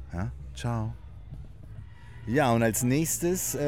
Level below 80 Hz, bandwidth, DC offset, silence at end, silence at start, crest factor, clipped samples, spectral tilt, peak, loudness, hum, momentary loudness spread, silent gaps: -46 dBFS; 17 kHz; 0.3%; 0 s; 0 s; 18 dB; under 0.1%; -5 dB/octave; -12 dBFS; -28 LUFS; none; 22 LU; none